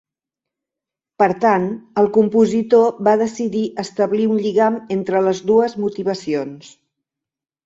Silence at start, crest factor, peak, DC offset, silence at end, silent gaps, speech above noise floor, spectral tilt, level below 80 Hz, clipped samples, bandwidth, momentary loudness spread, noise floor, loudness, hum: 1.2 s; 16 dB; -2 dBFS; under 0.1%; 1 s; none; 70 dB; -6.5 dB/octave; -62 dBFS; under 0.1%; 7.8 kHz; 8 LU; -87 dBFS; -17 LUFS; none